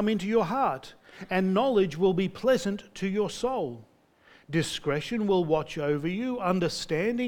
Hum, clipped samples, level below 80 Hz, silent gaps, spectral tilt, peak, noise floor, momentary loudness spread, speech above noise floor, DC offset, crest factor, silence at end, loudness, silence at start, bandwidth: none; under 0.1%; -56 dBFS; none; -6 dB/octave; -10 dBFS; -59 dBFS; 8 LU; 32 dB; under 0.1%; 16 dB; 0 s; -28 LUFS; 0 s; 17 kHz